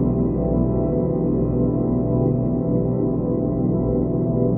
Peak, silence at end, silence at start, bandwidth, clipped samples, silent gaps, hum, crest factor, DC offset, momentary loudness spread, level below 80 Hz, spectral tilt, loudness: -6 dBFS; 0 s; 0 s; 2.4 kHz; under 0.1%; none; none; 14 dB; under 0.1%; 1 LU; -32 dBFS; -16.5 dB/octave; -21 LUFS